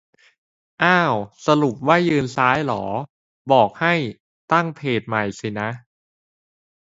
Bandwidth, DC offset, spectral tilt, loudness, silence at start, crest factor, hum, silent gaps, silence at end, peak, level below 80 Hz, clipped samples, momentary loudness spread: 8 kHz; under 0.1%; -6 dB/octave; -20 LUFS; 0.8 s; 20 dB; none; 3.10-3.45 s, 4.20-4.48 s; 1.15 s; 0 dBFS; -58 dBFS; under 0.1%; 12 LU